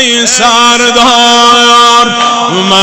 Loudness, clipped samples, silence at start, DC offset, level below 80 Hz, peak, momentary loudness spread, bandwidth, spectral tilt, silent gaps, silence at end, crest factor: -4 LUFS; 1%; 0 s; under 0.1%; -42 dBFS; 0 dBFS; 5 LU; 16.5 kHz; -1.5 dB/octave; none; 0 s; 6 dB